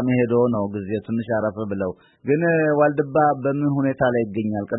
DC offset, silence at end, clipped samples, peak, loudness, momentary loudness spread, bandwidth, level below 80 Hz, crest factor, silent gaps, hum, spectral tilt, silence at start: under 0.1%; 0 s; under 0.1%; -6 dBFS; -21 LUFS; 8 LU; 4 kHz; -58 dBFS; 16 dB; none; none; -12.5 dB/octave; 0 s